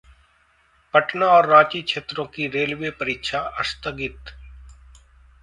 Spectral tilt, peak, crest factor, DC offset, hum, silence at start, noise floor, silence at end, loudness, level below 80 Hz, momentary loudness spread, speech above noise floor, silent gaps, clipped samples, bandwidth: -4.5 dB/octave; 0 dBFS; 22 dB; under 0.1%; none; 0.95 s; -60 dBFS; 0.7 s; -20 LUFS; -48 dBFS; 16 LU; 39 dB; none; under 0.1%; 11.5 kHz